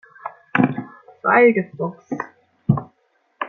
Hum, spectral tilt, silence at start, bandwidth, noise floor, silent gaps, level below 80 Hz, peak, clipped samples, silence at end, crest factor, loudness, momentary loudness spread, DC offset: none; -9.5 dB/octave; 0.25 s; 6.6 kHz; -64 dBFS; none; -56 dBFS; -2 dBFS; under 0.1%; 0 s; 18 dB; -20 LUFS; 21 LU; under 0.1%